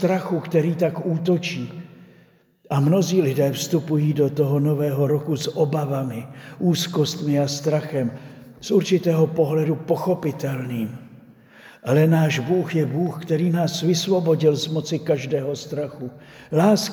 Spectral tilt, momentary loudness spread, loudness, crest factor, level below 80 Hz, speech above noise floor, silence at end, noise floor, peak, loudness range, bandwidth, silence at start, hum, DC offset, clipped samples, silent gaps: -6.5 dB/octave; 10 LU; -22 LUFS; 16 dB; -66 dBFS; 34 dB; 0 s; -55 dBFS; -6 dBFS; 2 LU; 19 kHz; 0 s; none; under 0.1%; under 0.1%; none